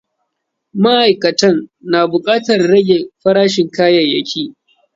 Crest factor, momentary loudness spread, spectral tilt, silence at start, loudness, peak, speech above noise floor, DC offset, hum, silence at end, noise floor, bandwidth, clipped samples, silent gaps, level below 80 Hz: 14 dB; 9 LU; -5 dB/octave; 0.75 s; -13 LUFS; 0 dBFS; 61 dB; under 0.1%; none; 0.45 s; -73 dBFS; 7.8 kHz; under 0.1%; none; -58 dBFS